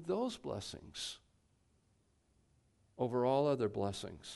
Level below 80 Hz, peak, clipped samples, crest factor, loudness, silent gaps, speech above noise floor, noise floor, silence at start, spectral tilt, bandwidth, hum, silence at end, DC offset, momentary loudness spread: -68 dBFS; -20 dBFS; under 0.1%; 18 dB; -38 LUFS; none; 37 dB; -75 dBFS; 0 s; -5.5 dB/octave; 11.5 kHz; none; 0 s; under 0.1%; 13 LU